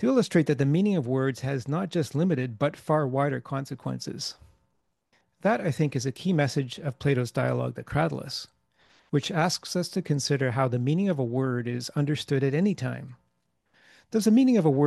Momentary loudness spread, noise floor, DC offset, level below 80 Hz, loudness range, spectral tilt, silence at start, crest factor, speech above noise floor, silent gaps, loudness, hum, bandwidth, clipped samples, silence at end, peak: 11 LU; -75 dBFS; under 0.1%; -62 dBFS; 3 LU; -6.5 dB/octave; 0 s; 18 dB; 49 dB; none; -27 LUFS; none; 12.5 kHz; under 0.1%; 0 s; -8 dBFS